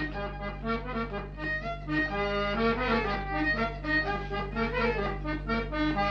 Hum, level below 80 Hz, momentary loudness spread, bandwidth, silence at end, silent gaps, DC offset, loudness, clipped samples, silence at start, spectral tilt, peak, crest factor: 50 Hz at -40 dBFS; -40 dBFS; 7 LU; 7 kHz; 0 s; none; under 0.1%; -30 LUFS; under 0.1%; 0 s; -7 dB/octave; -16 dBFS; 16 dB